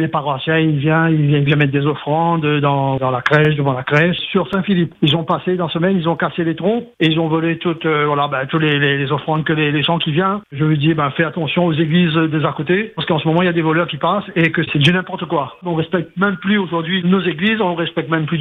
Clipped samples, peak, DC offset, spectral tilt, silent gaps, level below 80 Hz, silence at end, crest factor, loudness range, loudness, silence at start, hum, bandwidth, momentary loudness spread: under 0.1%; 0 dBFS; under 0.1%; -8 dB/octave; none; -54 dBFS; 0 s; 16 dB; 2 LU; -16 LUFS; 0 s; none; 6.6 kHz; 5 LU